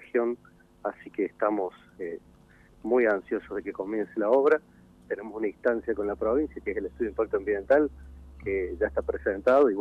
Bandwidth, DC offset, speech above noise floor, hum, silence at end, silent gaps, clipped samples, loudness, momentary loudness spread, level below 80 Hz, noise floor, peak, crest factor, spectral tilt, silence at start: 6 kHz; under 0.1%; 29 dB; none; 0 s; none; under 0.1%; -28 LUFS; 14 LU; -52 dBFS; -56 dBFS; -10 dBFS; 18 dB; -8 dB/octave; 0 s